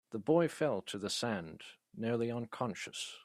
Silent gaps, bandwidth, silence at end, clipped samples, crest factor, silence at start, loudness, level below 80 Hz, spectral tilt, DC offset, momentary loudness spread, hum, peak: none; 14.5 kHz; 0 s; under 0.1%; 20 dB; 0.1 s; -36 LUFS; -76 dBFS; -5 dB/octave; under 0.1%; 12 LU; none; -16 dBFS